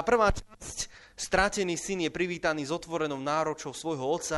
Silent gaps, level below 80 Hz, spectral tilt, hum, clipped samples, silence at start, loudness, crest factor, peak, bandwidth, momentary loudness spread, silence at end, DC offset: none; -46 dBFS; -3.5 dB/octave; none; under 0.1%; 0 s; -30 LUFS; 20 dB; -10 dBFS; 11.5 kHz; 11 LU; 0 s; under 0.1%